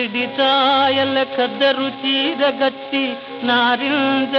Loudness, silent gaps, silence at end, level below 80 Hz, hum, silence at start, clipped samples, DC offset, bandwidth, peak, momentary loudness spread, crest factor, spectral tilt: -17 LUFS; none; 0 s; -68 dBFS; none; 0 s; under 0.1%; under 0.1%; 6.2 kHz; -6 dBFS; 7 LU; 12 dB; -5.5 dB/octave